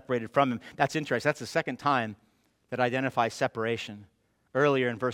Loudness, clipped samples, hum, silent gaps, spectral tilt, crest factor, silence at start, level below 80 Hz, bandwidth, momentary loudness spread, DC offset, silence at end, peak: -29 LUFS; under 0.1%; none; none; -5.5 dB/octave; 22 dB; 0.1 s; -70 dBFS; 16.5 kHz; 9 LU; under 0.1%; 0 s; -6 dBFS